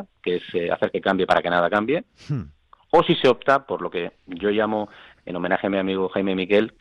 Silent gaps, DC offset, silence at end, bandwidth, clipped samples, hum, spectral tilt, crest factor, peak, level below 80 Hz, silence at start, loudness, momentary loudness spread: none; under 0.1%; 0.1 s; 10.5 kHz; under 0.1%; none; -7 dB/octave; 18 dB; -4 dBFS; -56 dBFS; 0 s; -22 LUFS; 12 LU